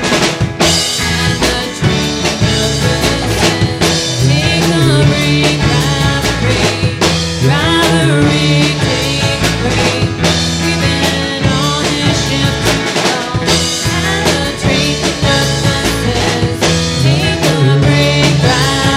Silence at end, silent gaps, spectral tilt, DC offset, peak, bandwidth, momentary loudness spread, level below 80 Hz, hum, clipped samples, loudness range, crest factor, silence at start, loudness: 0 s; none; -4.5 dB/octave; under 0.1%; 0 dBFS; 16 kHz; 3 LU; -28 dBFS; none; under 0.1%; 1 LU; 12 dB; 0 s; -12 LUFS